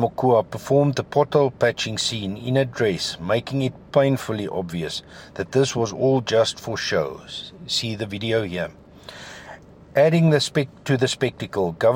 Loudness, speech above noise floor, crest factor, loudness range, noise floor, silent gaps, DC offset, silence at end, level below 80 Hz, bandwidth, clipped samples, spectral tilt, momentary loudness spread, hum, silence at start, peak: -22 LUFS; 21 dB; 18 dB; 3 LU; -43 dBFS; none; under 0.1%; 0 s; -56 dBFS; 16.5 kHz; under 0.1%; -5 dB/octave; 14 LU; none; 0 s; -4 dBFS